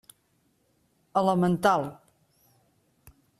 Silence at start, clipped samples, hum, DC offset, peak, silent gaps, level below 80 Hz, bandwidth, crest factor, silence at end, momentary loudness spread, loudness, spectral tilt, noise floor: 1.15 s; under 0.1%; none; under 0.1%; -8 dBFS; none; -66 dBFS; 13.5 kHz; 22 dB; 1.45 s; 7 LU; -25 LUFS; -6.5 dB/octave; -70 dBFS